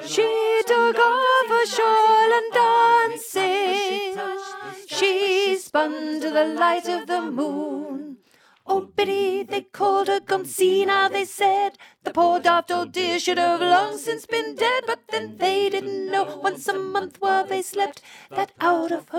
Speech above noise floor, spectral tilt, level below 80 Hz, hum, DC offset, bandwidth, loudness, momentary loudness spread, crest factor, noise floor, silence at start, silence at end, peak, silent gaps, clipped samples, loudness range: 35 dB; -2.5 dB/octave; -74 dBFS; none; under 0.1%; 17 kHz; -21 LUFS; 11 LU; 16 dB; -57 dBFS; 0 s; 0 s; -6 dBFS; none; under 0.1%; 6 LU